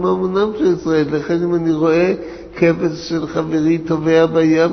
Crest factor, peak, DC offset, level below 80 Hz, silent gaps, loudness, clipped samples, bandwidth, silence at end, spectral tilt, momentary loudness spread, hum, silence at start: 14 dB; -2 dBFS; under 0.1%; -46 dBFS; none; -16 LUFS; under 0.1%; 6.4 kHz; 0 s; -7 dB/octave; 7 LU; none; 0 s